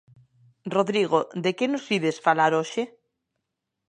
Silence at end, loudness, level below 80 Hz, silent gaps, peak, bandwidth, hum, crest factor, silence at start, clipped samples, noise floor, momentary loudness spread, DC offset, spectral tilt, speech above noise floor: 1.05 s; -24 LUFS; -78 dBFS; none; -6 dBFS; 10 kHz; none; 20 dB; 0.65 s; under 0.1%; -82 dBFS; 10 LU; under 0.1%; -5 dB/octave; 58 dB